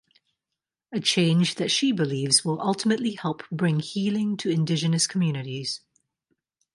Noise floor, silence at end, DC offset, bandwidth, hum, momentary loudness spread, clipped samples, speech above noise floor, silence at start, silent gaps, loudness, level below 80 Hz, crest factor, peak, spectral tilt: -87 dBFS; 1 s; under 0.1%; 11.5 kHz; none; 10 LU; under 0.1%; 63 dB; 0.9 s; none; -24 LUFS; -70 dBFS; 20 dB; -6 dBFS; -4.5 dB/octave